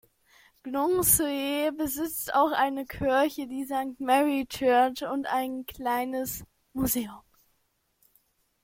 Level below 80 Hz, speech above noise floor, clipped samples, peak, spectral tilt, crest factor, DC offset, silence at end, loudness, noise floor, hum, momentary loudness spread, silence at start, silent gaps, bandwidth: -54 dBFS; 46 dB; under 0.1%; -6 dBFS; -3 dB/octave; 22 dB; under 0.1%; 1.45 s; -27 LUFS; -73 dBFS; none; 12 LU; 0.65 s; none; 16.5 kHz